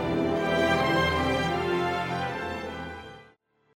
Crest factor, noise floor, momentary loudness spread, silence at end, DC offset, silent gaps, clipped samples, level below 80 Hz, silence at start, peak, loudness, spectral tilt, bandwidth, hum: 14 dB; -61 dBFS; 14 LU; 0.5 s; under 0.1%; none; under 0.1%; -48 dBFS; 0 s; -12 dBFS; -26 LUFS; -5.5 dB/octave; 16 kHz; none